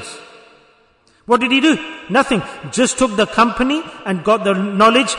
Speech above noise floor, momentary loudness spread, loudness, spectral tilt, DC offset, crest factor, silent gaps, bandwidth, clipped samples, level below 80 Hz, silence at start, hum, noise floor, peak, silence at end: 39 dB; 9 LU; -16 LUFS; -4 dB/octave; under 0.1%; 16 dB; none; 11 kHz; under 0.1%; -46 dBFS; 0 s; none; -55 dBFS; -2 dBFS; 0 s